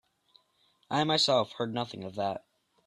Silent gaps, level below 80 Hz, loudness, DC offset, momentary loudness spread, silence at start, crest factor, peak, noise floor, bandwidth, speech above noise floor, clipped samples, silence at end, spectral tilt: none; -72 dBFS; -29 LUFS; under 0.1%; 11 LU; 0.9 s; 20 dB; -14 dBFS; -70 dBFS; 12.5 kHz; 41 dB; under 0.1%; 0.5 s; -4 dB/octave